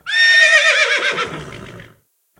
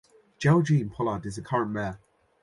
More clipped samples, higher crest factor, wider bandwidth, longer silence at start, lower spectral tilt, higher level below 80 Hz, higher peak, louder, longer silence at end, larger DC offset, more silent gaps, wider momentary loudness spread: neither; about the same, 16 dB vs 18 dB; first, 13 kHz vs 11.5 kHz; second, 0.05 s vs 0.4 s; second, -0.5 dB/octave vs -7.5 dB/octave; about the same, -54 dBFS vs -56 dBFS; first, 0 dBFS vs -10 dBFS; first, -11 LUFS vs -27 LUFS; first, 0.6 s vs 0.45 s; neither; neither; first, 20 LU vs 12 LU